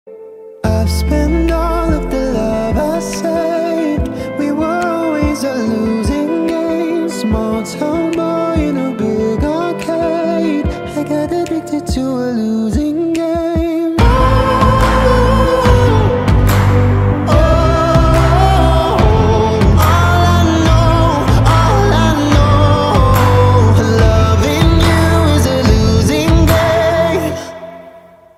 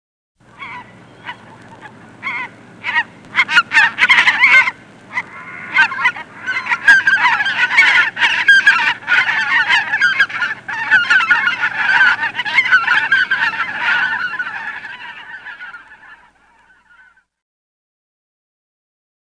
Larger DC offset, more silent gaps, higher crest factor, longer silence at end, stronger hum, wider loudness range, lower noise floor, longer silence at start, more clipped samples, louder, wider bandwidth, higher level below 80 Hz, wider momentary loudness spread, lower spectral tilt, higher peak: neither; neither; about the same, 12 dB vs 16 dB; second, 0.4 s vs 3.05 s; neither; second, 6 LU vs 11 LU; second, -39 dBFS vs -51 dBFS; second, 0.05 s vs 0.6 s; neither; about the same, -13 LUFS vs -12 LUFS; first, 15.5 kHz vs 10.5 kHz; first, -20 dBFS vs -62 dBFS; second, 7 LU vs 21 LU; first, -6.5 dB/octave vs -0.5 dB/octave; about the same, 0 dBFS vs 0 dBFS